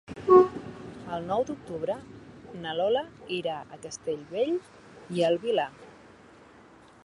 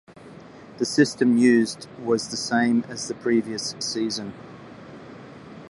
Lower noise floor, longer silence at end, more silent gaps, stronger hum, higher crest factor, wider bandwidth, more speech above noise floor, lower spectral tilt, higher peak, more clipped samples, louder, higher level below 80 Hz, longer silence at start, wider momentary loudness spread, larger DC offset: first, -54 dBFS vs -44 dBFS; first, 1.15 s vs 0.05 s; neither; neither; about the same, 24 dB vs 20 dB; about the same, 10.5 kHz vs 11.5 kHz; about the same, 24 dB vs 22 dB; first, -5.5 dB/octave vs -4 dB/octave; about the same, -6 dBFS vs -4 dBFS; neither; second, -28 LUFS vs -23 LUFS; about the same, -62 dBFS vs -64 dBFS; about the same, 0.1 s vs 0.1 s; second, 21 LU vs 24 LU; neither